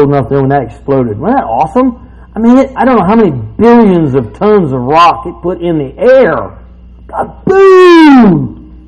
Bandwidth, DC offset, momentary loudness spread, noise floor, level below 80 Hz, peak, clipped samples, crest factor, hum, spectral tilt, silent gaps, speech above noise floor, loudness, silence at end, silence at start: 9.6 kHz; under 0.1%; 14 LU; -32 dBFS; -34 dBFS; 0 dBFS; 3%; 8 dB; none; -8 dB/octave; none; 25 dB; -7 LUFS; 0.15 s; 0 s